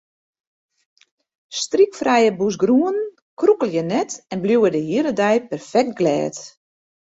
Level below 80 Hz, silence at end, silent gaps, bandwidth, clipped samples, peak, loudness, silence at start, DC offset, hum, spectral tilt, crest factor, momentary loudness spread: -64 dBFS; 0.7 s; 3.22-3.37 s; 8 kHz; under 0.1%; -4 dBFS; -19 LUFS; 1.5 s; under 0.1%; none; -5 dB/octave; 16 dB; 10 LU